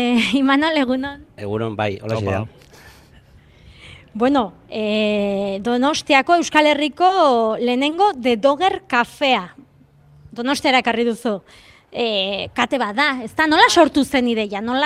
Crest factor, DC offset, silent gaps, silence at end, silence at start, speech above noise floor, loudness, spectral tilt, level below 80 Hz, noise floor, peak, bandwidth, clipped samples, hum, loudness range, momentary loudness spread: 18 dB; under 0.1%; none; 0 s; 0 s; 32 dB; -18 LUFS; -4 dB/octave; -54 dBFS; -50 dBFS; 0 dBFS; 15 kHz; under 0.1%; none; 8 LU; 11 LU